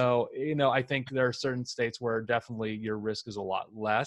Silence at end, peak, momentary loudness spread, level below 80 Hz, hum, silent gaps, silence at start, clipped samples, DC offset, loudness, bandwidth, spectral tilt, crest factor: 0 s; -12 dBFS; 8 LU; -68 dBFS; none; none; 0 s; under 0.1%; under 0.1%; -31 LUFS; 11 kHz; -5.5 dB/octave; 18 dB